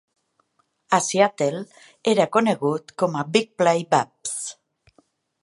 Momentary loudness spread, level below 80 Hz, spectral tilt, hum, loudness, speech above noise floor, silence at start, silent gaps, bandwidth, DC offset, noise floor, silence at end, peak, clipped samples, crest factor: 10 LU; -72 dBFS; -4 dB/octave; none; -22 LUFS; 46 dB; 0.9 s; none; 11.5 kHz; under 0.1%; -68 dBFS; 0.9 s; -2 dBFS; under 0.1%; 20 dB